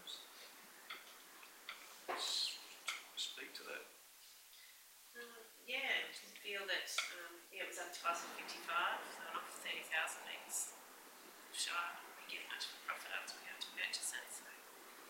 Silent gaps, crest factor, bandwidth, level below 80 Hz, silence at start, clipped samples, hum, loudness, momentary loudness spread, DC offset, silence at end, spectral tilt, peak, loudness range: none; 24 dB; 16 kHz; under -90 dBFS; 0 s; under 0.1%; none; -44 LUFS; 18 LU; under 0.1%; 0 s; 1.5 dB/octave; -24 dBFS; 3 LU